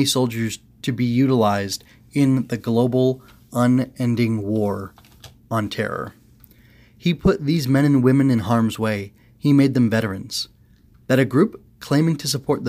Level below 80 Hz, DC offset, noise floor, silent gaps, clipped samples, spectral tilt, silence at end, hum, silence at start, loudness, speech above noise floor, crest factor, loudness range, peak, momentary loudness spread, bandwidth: -48 dBFS; under 0.1%; -52 dBFS; none; under 0.1%; -6 dB/octave; 0 s; none; 0 s; -20 LUFS; 33 dB; 16 dB; 6 LU; -4 dBFS; 12 LU; 16 kHz